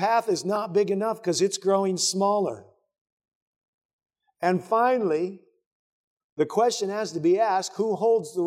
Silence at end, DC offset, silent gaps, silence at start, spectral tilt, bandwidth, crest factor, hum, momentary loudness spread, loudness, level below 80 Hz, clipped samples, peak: 0 s; under 0.1%; 3.01-3.05 s, 3.12-3.17 s, 3.35-3.61 s, 3.68-3.99 s, 5.66-6.17 s, 6.24-6.36 s; 0 s; -4 dB/octave; 15.5 kHz; 16 dB; none; 6 LU; -24 LUFS; -82 dBFS; under 0.1%; -10 dBFS